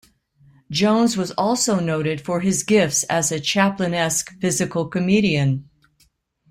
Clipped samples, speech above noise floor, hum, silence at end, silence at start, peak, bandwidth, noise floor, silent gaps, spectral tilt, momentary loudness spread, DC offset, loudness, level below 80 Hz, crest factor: under 0.1%; 43 dB; none; 0.85 s; 0.7 s; -4 dBFS; 16.5 kHz; -62 dBFS; none; -4 dB/octave; 6 LU; under 0.1%; -20 LUFS; -56 dBFS; 16 dB